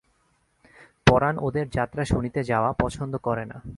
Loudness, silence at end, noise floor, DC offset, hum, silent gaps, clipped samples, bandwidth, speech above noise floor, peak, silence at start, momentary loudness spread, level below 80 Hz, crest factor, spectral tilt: -25 LUFS; 0 s; -67 dBFS; under 0.1%; none; none; under 0.1%; 11.5 kHz; 42 dB; 0 dBFS; 0.8 s; 9 LU; -40 dBFS; 26 dB; -6.5 dB/octave